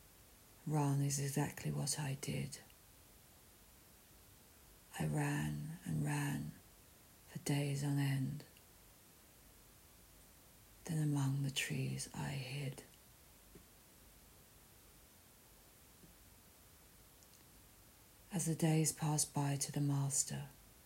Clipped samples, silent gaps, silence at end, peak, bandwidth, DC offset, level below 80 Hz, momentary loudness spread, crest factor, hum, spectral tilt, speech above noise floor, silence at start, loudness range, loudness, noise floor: under 0.1%; none; 0.2 s; -20 dBFS; 16 kHz; under 0.1%; -68 dBFS; 25 LU; 22 dB; none; -4.5 dB/octave; 26 dB; 0.2 s; 22 LU; -39 LUFS; -64 dBFS